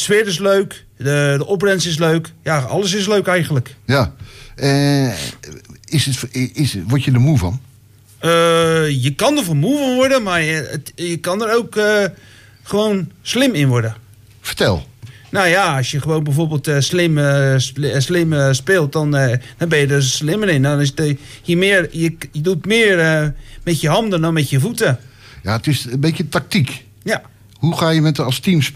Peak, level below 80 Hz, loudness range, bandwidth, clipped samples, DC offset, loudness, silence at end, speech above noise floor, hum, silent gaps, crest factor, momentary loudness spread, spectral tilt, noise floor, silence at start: -4 dBFS; -44 dBFS; 3 LU; 15.5 kHz; under 0.1%; under 0.1%; -16 LUFS; 0 s; 30 dB; none; none; 12 dB; 9 LU; -5 dB/octave; -46 dBFS; 0 s